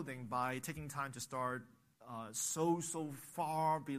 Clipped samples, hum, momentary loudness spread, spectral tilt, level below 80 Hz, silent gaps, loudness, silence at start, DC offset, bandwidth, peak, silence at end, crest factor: under 0.1%; none; 9 LU; -4.5 dB/octave; -72 dBFS; none; -40 LUFS; 0 s; under 0.1%; 15.5 kHz; -24 dBFS; 0 s; 18 dB